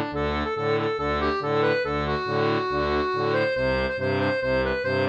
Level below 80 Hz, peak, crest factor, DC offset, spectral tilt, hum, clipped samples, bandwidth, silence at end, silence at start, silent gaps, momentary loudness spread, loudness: -40 dBFS; -10 dBFS; 14 dB; under 0.1%; -7 dB/octave; none; under 0.1%; 8.4 kHz; 0 s; 0 s; none; 2 LU; -24 LUFS